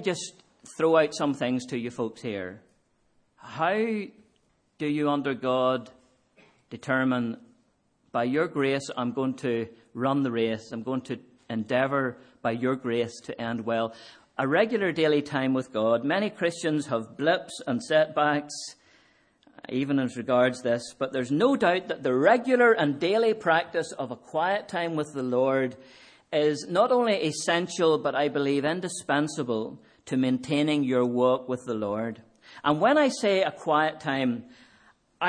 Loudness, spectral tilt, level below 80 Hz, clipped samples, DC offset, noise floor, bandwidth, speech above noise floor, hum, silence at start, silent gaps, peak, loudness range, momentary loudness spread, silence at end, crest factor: -26 LUFS; -5 dB/octave; -72 dBFS; under 0.1%; under 0.1%; -68 dBFS; 10.5 kHz; 43 dB; none; 0 s; none; -8 dBFS; 6 LU; 12 LU; 0 s; 20 dB